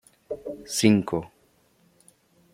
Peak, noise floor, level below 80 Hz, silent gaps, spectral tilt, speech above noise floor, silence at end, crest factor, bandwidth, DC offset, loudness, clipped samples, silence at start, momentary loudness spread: -4 dBFS; -63 dBFS; -62 dBFS; none; -5 dB/octave; 39 dB; 1.25 s; 24 dB; 15.5 kHz; under 0.1%; -25 LUFS; under 0.1%; 0.3 s; 18 LU